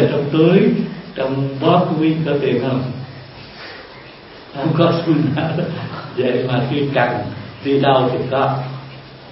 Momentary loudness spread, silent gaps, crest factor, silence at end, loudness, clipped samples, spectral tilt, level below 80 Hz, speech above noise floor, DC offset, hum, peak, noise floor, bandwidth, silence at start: 20 LU; none; 18 dB; 0 s; -17 LUFS; under 0.1%; -11 dB/octave; -52 dBFS; 22 dB; under 0.1%; none; 0 dBFS; -38 dBFS; 5.8 kHz; 0 s